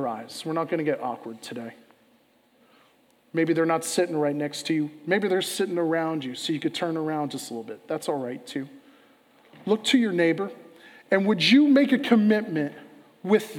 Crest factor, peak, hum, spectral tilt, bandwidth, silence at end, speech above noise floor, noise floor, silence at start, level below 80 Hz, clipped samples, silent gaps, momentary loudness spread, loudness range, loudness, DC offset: 20 dB; -6 dBFS; none; -5 dB/octave; 17 kHz; 0 s; 38 dB; -62 dBFS; 0 s; -82 dBFS; under 0.1%; none; 15 LU; 9 LU; -25 LUFS; under 0.1%